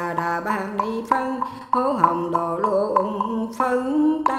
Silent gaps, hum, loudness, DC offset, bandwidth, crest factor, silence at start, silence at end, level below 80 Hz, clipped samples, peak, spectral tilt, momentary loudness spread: none; none; -22 LUFS; under 0.1%; 14 kHz; 20 dB; 0 s; 0 s; -58 dBFS; under 0.1%; -2 dBFS; -6.5 dB/octave; 6 LU